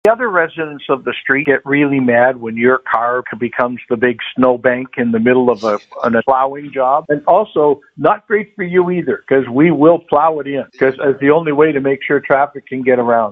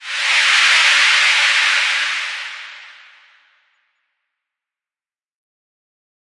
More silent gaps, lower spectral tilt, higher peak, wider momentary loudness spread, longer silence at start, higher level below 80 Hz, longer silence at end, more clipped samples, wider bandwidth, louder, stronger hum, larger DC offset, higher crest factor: neither; first, -8 dB/octave vs 5.5 dB/octave; about the same, 0 dBFS vs 0 dBFS; second, 7 LU vs 17 LU; about the same, 0.05 s vs 0 s; first, -56 dBFS vs -86 dBFS; second, 0 s vs 3.4 s; neither; second, 7 kHz vs 11.5 kHz; about the same, -14 LUFS vs -12 LUFS; neither; neither; about the same, 14 dB vs 18 dB